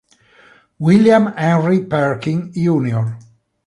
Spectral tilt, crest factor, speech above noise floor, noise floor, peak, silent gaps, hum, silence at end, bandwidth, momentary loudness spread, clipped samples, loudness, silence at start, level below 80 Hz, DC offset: -8 dB/octave; 14 dB; 35 dB; -49 dBFS; -2 dBFS; none; none; 0.45 s; 11 kHz; 10 LU; under 0.1%; -16 LUFS; 0.8 s; -54 dBFS; under 0.1%